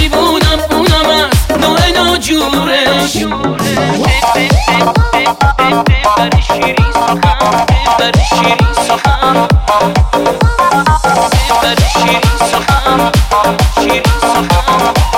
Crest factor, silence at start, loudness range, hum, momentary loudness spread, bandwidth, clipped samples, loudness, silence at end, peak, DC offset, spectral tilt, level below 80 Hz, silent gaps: 10 dB; 0 s; 1 LU; none; 2 LU; 16.5 kHz; under 0.1%; -10 LUFS; 0 s; 0 dBFS; under 0.1%; -4.5 dB/octave; -18 dBFS; none